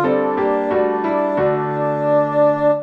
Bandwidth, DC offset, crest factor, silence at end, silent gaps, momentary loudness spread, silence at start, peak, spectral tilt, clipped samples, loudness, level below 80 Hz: 5.2 kHz; under 0.1%; 10 dB; 0 s; none; 4 LU; 0 s; -6 dBFS; -9 dB/octave; under 0.1%; -17 LUFS; -54 dBFS